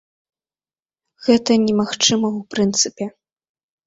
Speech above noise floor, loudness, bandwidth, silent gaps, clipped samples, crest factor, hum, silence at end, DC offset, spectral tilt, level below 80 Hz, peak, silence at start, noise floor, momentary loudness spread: over 72 dB; -18 LUFS; 8 kHz; none; under 0.1%; 18 dB; none; 0.8 s; under 0.1%; -3.5 dB/octave; -60 dBFS; -2 dBFS; 1.2 s; under -90 dBFS; 9 LU